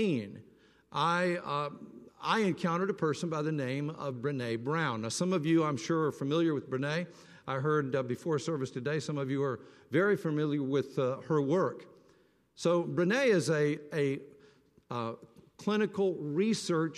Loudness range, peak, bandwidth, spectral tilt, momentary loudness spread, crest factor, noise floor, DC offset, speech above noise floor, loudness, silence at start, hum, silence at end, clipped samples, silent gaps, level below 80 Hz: 2 LU; -14 dBFS; 13 kHz; -6 dB/octave; 10 LU; 16 dB; -66 dBFS; under 0.1%; 35 dB; -32 LUFS; 0 s; none; 0 s; under 0.1%; none; -76 dBFS